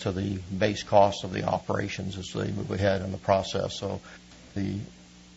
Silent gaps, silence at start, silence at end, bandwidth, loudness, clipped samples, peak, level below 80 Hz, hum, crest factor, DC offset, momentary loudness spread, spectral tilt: none; 0 s; 0 s; 8 kHz; -28 LUFS; under 0.1%; -6 dBFS; -56 dBFS; none; 22 dB; under 0.1%; 15 LU; -5.5 dB/octave